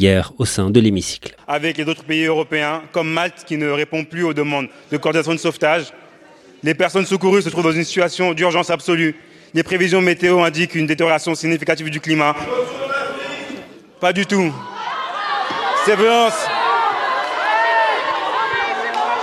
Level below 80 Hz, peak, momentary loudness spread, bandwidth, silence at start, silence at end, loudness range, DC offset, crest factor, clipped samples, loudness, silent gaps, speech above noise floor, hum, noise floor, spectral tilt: -54 dBFS; 0 dBFS; 9 LU; 13.5 kHz; 0 s; 0 s; 4 LU; under 0.1%; 18 dB; under 0.1%; -18 LUFS; none; 28 dB; none; -45 dBFS; -4.5 dB/octave